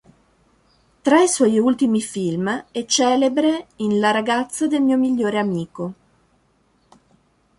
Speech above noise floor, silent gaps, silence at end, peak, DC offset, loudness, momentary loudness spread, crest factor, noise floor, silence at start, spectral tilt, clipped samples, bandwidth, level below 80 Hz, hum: 43 dB; none; 1.65 s; -2 dBFS; under 0.1%; -19 LUFS; 9 LU; 18 dB; -61 dBFS; 1.05 s; -4 dB/octave; under 0.1%; 11.5 kHz; -62 dBFS; none